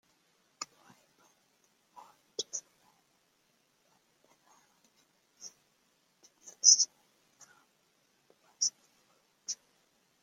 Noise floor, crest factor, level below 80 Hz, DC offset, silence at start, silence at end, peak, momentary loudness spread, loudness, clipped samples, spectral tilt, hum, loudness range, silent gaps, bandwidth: -73 dBFS; 32 dB; under -90 dBFS; under 0.1%; 0.6 s; 0.7 s; -6 dBFS; 29 LU; -28 LUFS; under 0.1%; 3.5 dB/octave; none; 17 LU; none; 16.5 kHz